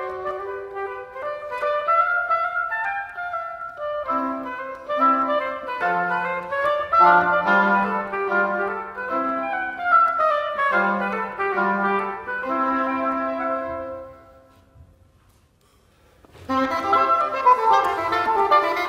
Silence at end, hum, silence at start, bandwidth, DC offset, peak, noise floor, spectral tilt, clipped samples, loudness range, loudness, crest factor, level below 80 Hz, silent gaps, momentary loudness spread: 0 s; none; 0 s; 15.5 kHz; under 0.1%; -4 dBFS; -58 dBFS; -5.5 dB/octave; under 0.1%; 7 LU; -21 LUFS; 18 dB; -60 dBFS; none; 13 LU